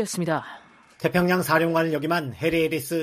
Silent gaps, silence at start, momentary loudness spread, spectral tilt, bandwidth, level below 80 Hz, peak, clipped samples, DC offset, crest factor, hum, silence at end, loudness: none; 0 s; 8 LU; -5.5 dB/octave; 15.5 kHz; -56 dBFS; -6 dBFS; under 0.1%; under 0.1%; 18 dB; none; 0 s; -23 LUFS